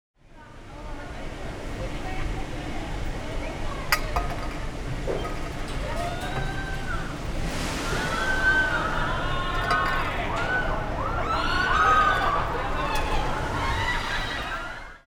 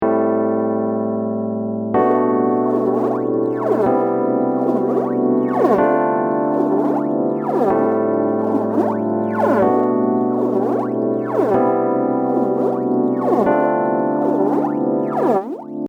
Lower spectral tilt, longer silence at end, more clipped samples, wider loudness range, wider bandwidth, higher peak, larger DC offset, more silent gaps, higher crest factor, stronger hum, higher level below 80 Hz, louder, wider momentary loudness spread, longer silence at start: second, -4.5 dB/octave vs -9.5 dB/octave; about the same, 0.1 s vs 0 s; neither; first, 8 LU vs 1 LU; first, 19 kHz vs 6.2 kHz; about the same, -4 dBFS vs -4 dBFS; neither; neither; first, 22 dB vs 14 dB; neither; first, -32 dBFS vs -60 dBFS; second, -27 LUFS vs -18 LUFS; first, 13 LU vs 4 LU; first, 0.3 s vs 0 s